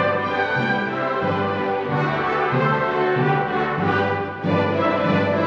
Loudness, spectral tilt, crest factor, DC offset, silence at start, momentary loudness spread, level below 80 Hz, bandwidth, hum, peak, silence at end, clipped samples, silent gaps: -21 LUFS; -8 dB/octave; 14 dB; under 0.1%; 0 s; 3 LU; -56 dBFS; 7.4 kHz; none; -8 dBFS; 0 s; under 0.1%; none